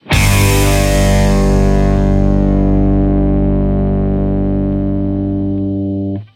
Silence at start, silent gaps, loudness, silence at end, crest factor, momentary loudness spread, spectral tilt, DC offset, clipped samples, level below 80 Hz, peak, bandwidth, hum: 0.05 s; none; -13 LUFS; 0.1 s; 12 dB; 6 LU; -6 dB/octave; under 0.1%; under 0.1%; -16 dBFS; 0 dBFS; 16.5 kHz; 50 Hz at -25 dBFS